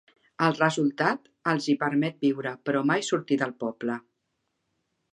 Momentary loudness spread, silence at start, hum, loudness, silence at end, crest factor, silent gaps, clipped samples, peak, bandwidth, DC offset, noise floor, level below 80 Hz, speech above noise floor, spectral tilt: 8 LU; 0.4 s; none; -27 LUFS; 1.15 s; 22 dB; none; under 0.1%; -6 dBFS; 10.5 kHz; under 0.1%; -78 dBFS; -74 dBFS; 52 dB; -5.5 dB/octave